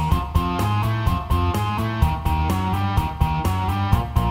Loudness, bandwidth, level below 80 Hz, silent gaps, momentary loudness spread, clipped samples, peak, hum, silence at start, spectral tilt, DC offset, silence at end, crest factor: -22 LUFS; 16 kHz; -26 dBFS; none; 2 LU; under 0.1%; -4 dBFS; none; 0 s; -6.5 dB/octave; under 0.1%; 0 s; 16 dB